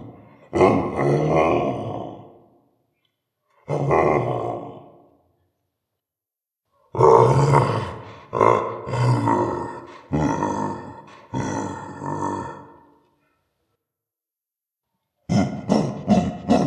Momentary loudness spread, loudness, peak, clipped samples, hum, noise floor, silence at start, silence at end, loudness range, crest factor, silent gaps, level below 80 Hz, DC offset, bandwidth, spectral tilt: 16 LU; -21 LUFS; 0 dBFS; under 0.1%; none; -89 dBFS; 0 s; 0 s; 13 LU; 22 dB; none; -46 dBFS; under 0.1%; 10.5 kHz; -7.5 dB/octave